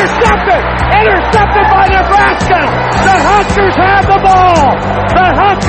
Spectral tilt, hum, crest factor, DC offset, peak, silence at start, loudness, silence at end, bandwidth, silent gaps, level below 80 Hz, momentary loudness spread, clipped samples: -5.5 dB/octave; none; 8 dB; under 0.1%; 0 dBFS; 0 s; -8 LUFS; 0 s; 8.8 kHz; none; -20 dBFS; 4 LU; 0.1%